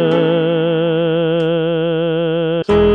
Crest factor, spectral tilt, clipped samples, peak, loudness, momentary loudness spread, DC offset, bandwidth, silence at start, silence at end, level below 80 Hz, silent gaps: 12 dB; -8.5 dB/octave; under 0.1%; -2 dBFS; -16 LUFS; 3 LU; 0.2%; 5.6 kHz; 0 s; 0 s; -38 dBFS; none